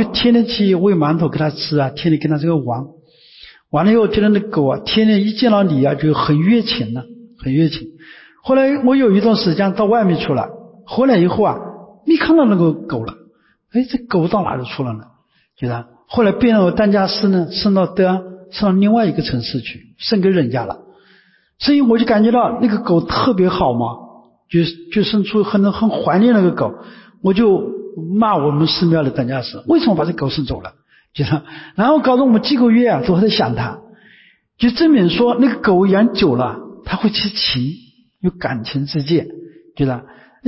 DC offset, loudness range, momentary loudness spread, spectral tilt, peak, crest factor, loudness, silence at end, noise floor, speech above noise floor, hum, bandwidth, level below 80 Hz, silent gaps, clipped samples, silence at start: under 0.1%; 3 LU; 12 LU; -10.5 dB/octave; -4 dBFS; 12 dB; -15 LUFS; 0 s; -53 dBFS; 38 dB; none; 5.8 kHz; -44 dBFS; none; under 0.1%; 0 s